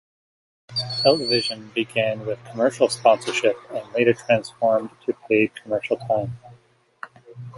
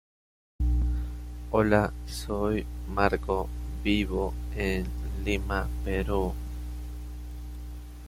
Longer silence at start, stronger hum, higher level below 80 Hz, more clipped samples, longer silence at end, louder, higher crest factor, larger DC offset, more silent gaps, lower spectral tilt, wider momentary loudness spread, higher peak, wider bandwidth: about the same, 0.7 s vs 0.6 s; second, none vs 60 Hz at -35 dBFS; second, -64 dBFS vs -34 dBFS; neither; about the same, 0 s vs 0 s; first, -22 LUFS vs -30 LUFS; about the same, 20 dB vs 22 dB; neither; neither; second, -4.5 dB/octave vs -6.5 dB/octave; about the same, 14 LU vs 15 LU; first, -2 dBFS vs -6 dBFS; second, 11.5 kHz vs 15.5 kHz